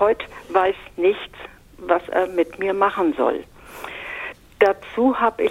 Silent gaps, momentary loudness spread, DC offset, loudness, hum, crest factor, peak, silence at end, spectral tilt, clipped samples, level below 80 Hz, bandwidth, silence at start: none; 17 LU; under 0.1%; -21 LUFS; none; 20 dB; 0 dBFS; 0 s; -5.5 dB/octave; under 0.1%; -52 dBFS; 16 kHz; 0 s